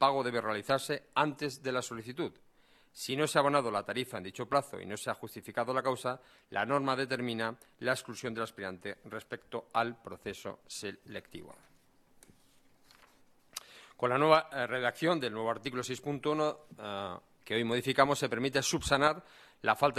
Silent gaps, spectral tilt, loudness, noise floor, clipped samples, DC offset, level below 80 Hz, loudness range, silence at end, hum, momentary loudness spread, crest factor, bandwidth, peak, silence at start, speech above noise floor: none; -4 dB/octave; -33 LUFS; -65 dBFS; under 0.1%; under 0.1%; -64 dBFS; 9 LU; 0 s; none; 15 LU; 24 dB; 14.5 kHz; -8 dBFS; 0 s; 32 dB